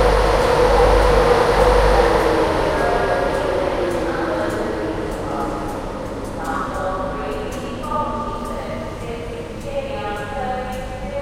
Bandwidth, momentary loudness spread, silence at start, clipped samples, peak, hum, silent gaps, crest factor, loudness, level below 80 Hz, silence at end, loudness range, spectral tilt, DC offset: 15.5 kHz; 13 LU; 0 s; under 0.1%; -2 dBFS; none; none; 16 dB; -20 LUFS; -26 dBFS; 0 s; 10 LU; -5.5 dB/octave; under 0.1%